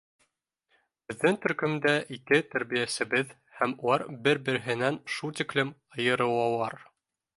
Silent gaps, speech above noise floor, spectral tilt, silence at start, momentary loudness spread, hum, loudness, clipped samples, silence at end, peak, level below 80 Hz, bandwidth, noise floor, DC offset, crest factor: none; 48 dB; -4.5 dB/octave; 1.1 s; 8 LU; none; -28 LUFS; under 0.1%; 0.6 s; -8 dBFS; -72 dBFS; 11.5 kHz; -76 dBFS; under 0.1%; 22 dB